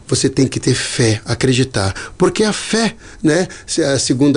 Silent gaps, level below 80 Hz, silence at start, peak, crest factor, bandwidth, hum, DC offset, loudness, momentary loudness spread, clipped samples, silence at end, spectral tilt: none; -42 dBFS; 0.05 s; -4 dBFS; 12 dB; 10.5 kHz; none; under 0.1%; -16 LUFS; 5 LU; under 0.1%; 0 s; -4.5 dB/octave